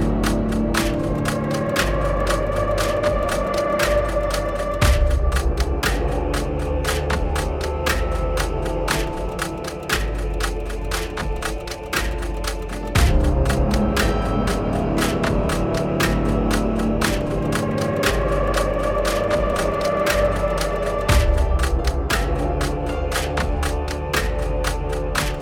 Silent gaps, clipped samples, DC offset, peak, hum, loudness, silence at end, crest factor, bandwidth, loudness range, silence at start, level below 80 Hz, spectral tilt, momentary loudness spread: none; under 0.1%; under 0.1%; -6 dBFS; none; -22 LUFS; 0 s; 16 dB; 18 kHz; 4 LU; 0 s; -24 dBFS; -5 dB/octave; 6 LU